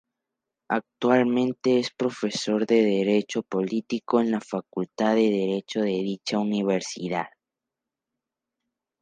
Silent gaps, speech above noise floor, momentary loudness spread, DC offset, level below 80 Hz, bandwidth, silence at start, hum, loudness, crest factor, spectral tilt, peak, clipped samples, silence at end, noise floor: none; 63 dB; 8 LU; under 0.1%; -74 dBFS; 9.6 kHz; 0.7 s; none; -25 LUFS; 20 dB; -5.5 dB/octave; -6 dBFS; under 0.1%; 1.75 s; -87 dBFS